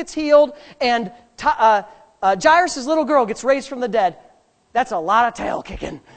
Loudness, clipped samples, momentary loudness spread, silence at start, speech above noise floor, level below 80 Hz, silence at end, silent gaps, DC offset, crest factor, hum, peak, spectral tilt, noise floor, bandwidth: -18 LUFS; under 0.1%; 11 LU; 0 s; 36 dB; -48 dBFS; 0.2 s; none; under 0.1%; 18 dB; none; -2 dBFS; -3.5 dB/octave; -54 dBFS; 9 kHz